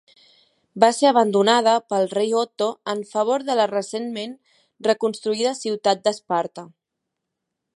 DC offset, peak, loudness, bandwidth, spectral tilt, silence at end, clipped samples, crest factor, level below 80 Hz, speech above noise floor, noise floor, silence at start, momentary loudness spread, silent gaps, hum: under 0.1%; 0 dBFS; -21 LUFS; 11.5 kHz; -3.5 dB/octave; 1.1 s; under 0.1%; 22 dB; -76 dBFS; 61 dB; -81 dBFS; 0.75 s; 12 LU; none; none